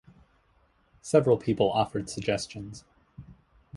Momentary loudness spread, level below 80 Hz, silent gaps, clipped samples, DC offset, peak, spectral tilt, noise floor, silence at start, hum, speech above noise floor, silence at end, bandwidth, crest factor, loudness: 21 LU; -56 dBFS; none; under 0.1%; under 0.1%; -8 dBFS; -5.5 dB/octave; -66 dBFS; 1.05 s; none; 39 dB; 0 s; 11.5 kHz; 22 dB; -27 LUFS